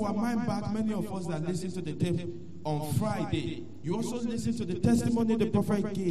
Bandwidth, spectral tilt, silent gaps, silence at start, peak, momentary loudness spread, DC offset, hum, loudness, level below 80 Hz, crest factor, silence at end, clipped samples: 13 kHz; -7 dB/octave; none; 0 s; -14 dBFS; 8 LU; 0.8%; none; -31 LUFS; -54 dBFS; 16 dB; 0 s; under 0.1%